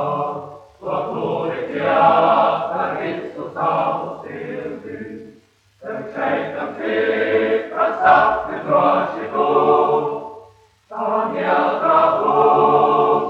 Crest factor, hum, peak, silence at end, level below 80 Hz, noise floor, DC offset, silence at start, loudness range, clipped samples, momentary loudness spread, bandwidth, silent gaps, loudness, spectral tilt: 16 dB; none; -2 dBFS; 0 s; -58 dBFS; -52 dBFS; under 0.1%; 0 s; 8 LU; under 0.1%; 17 LU; 6.6 kHz; none; -18 LUFS; -7 dB/octave